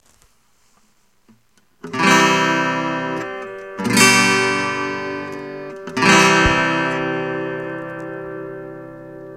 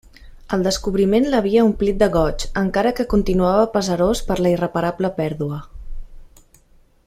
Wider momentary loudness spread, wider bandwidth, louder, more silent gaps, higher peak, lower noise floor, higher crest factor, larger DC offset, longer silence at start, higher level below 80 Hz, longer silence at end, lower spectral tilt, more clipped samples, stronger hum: first, 20 LU vs 7 LU; about the same, 16.5 kHz vs 15.5 kHz; first, -16 LUFS vs -19 LUFS; neither; about the same, 0 dBFS vs -2 dBFS; first, -60 dBFS vs -53 dBFS; about the same, 20 dB vs 16 dB; neither; first, 1.85 s vs 0.2 s; second, -42 dBFS vs -32 dBFS; second, 0 s vs 0.85 s; second, -3 dB/octave vs -6 dB/octave; neither; neither